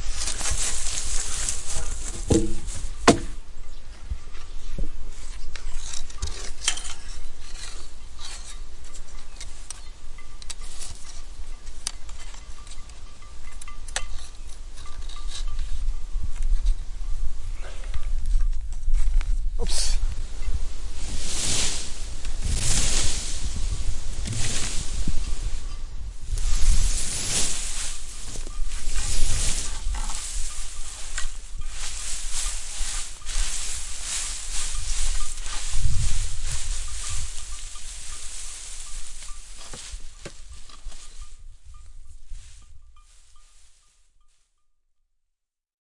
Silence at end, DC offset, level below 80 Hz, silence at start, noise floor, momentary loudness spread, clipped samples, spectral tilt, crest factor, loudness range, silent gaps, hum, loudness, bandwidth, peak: 2.2 s; under 0.1%; -28 dBFS; 0 s; -78 dBFS; 18 LU; under 0.1%; -3 dB/octave; 22 dB; 13 LU; none; none; -30 LUFS; 11.5 kHz; 0 dBFS